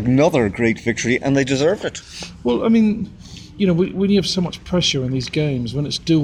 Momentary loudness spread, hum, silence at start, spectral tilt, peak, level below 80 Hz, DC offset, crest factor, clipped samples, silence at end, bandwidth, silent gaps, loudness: 11 LU; none; 0 s; -5.5 dB/octave; -4 dBFS; -42 dBFS; under 0.1%; 16 dB; under 0.1%; 0 s; 12 kHz; none; -19 LUFS